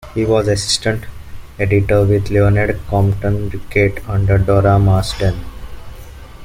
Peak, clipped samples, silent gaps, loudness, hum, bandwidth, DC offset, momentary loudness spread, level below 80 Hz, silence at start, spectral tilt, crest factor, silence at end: -2 dBFS; under 0.1%; none; -15 LUFS; none; 15 kHz; under 0.1%; 11 LU; -30 dBFS; 0 s; -6 dB/octave; 14 dB; 0 s